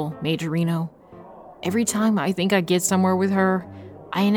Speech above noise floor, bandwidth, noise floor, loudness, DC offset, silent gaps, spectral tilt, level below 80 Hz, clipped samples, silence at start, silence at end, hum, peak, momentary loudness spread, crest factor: 22 dB; 17.5 kHz; -44 dBFS; -22 LUFS; under 0.1%; none; -5 dB/octave; -62 dBFS; under 0.1%; 0 s; 0 s; none; -6 dBFS; 11 LU; 16 dB